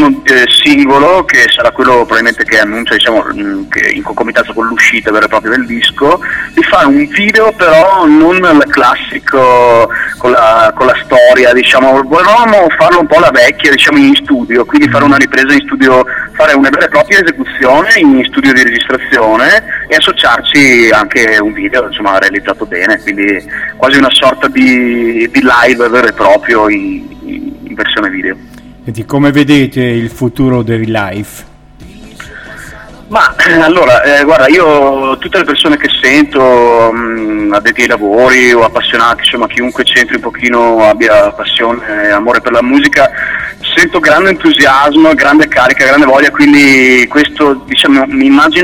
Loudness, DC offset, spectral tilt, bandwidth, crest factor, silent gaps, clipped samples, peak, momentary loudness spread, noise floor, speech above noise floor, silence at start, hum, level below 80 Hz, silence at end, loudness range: -6 LUFS; under 0.1%; -4 dB/octave; 17 kHz; 6 dB; none; 4%; 0 dBFS; 8 LU; -32 dBFS; 26 dB; 0 s; none; -36 dBFS; 0 s; 6 LU